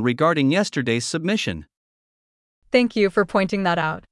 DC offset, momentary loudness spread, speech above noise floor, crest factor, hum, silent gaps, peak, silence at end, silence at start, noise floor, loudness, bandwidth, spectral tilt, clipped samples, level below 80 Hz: under 0.1%; 5 LU; over 70 dB; 18 dB; none; 1.77-2.62 s; -4 dBFS; 0.1 s; 0 s; under -90 dBFS; -21 LUFS; 12 kHz; -5 dB/octave; under 0.1%; -54 dBFS